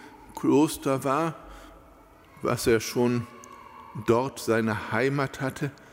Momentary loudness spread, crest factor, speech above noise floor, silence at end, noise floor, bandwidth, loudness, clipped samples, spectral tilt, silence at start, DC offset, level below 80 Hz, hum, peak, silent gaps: 20 LU; 18 dB; 27 dB; 0.15 s; -53 dBFS; 16 kHz; -26 LUFS; under 0.1%; -5.5 dB/octave; 0 s; under 0.1%; -54 dBFS; none; -8 dBFS; none